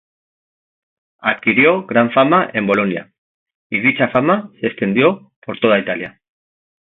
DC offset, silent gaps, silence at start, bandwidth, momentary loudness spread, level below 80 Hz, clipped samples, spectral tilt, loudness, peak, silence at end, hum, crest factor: under 0.1%; 3.18-3.46 s, 3.55-3.70 s, 5.36-5.42 s; 1.25 s; 4.1 kHz; 11 LU; -60 dBFS; under 0.1%; -8.5 dB/octave; -15 LUFS; 0 dBFS; 0.85 s; none; 18 dB